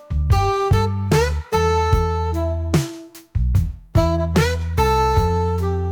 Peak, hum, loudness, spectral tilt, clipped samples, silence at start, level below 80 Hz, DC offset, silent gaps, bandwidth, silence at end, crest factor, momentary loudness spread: -6 dBFS; none; -19 LUFS; -6.5 dB/octave; under 0.1%; 0.1 s; -26 dBFS; under 0.1%; none; 19 kHz; 0 s; 14 dB; 5 LU